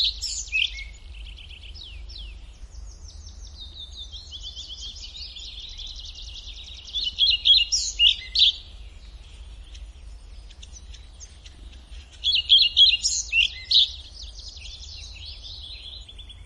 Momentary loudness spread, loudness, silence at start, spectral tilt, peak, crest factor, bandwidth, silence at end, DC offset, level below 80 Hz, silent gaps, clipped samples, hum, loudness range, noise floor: 26 LU; -18 LUFS; 0 s; 1.5 dB/octave; -6 dBFS; 20 dB; 12 kHz; 0 s; under 0.1%; -42 dBFS; none; under 0.1%; none; 20 LU; -44 dBFS